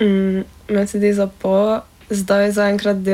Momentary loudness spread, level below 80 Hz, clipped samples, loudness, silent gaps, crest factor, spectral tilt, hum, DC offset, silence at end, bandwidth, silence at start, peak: 8 LU; -48 dBFS; under 0.1%; -18 LUFS; none; 12 dB; -6 dB/octave; none; under 0.1%; 0 s; 15.5 kHz; 0 s; -4 dBFS